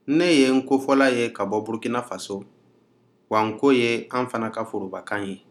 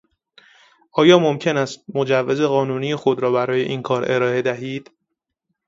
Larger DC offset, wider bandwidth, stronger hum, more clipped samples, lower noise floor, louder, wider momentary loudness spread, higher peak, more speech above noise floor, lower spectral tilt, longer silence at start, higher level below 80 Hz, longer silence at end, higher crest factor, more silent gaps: neither; first, 13 kHz vs 7.8 kHz; neither; neither; second, -61 dBFS vs -78 dBFS; second, -23 LUFS vs -19 LUFS; about the same, 13 LU vs 11 LU; second, -4 dBFS vs 0 dBFS; second, 39 dB vs 60 dB; about the same, -5 dB/octave vs -6 dB/octave; second, 0.05 s vs 0.95 s; second, -76 dBFS vs -64 dBFS; second, 0.15 s vs 0.85 s; about the same, 18 dB vs 20 dB; neither